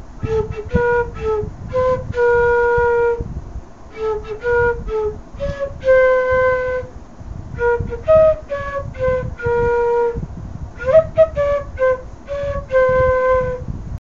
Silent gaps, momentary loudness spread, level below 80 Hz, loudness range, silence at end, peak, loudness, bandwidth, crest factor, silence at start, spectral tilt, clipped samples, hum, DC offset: none; 15 LU; -32 dBFS; 2 LU; 0.05 s; -2 dBFS; -18 LUFS; 7.2 kHz; 16 dB; 0 s; -7.5 dB/octave; under 0.1%; none; 0.8%